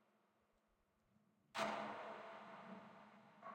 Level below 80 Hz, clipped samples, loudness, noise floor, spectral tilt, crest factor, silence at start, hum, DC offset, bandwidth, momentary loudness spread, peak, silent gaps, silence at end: under -90 dBFS; under 0.1%; -50 LUFS; -82 dBFS; -3.5 dB/octave; 24 dB; 1.55 s; none; under 0.1%; 16 kHz; 18 LU; -30 dBFS; none; 0 s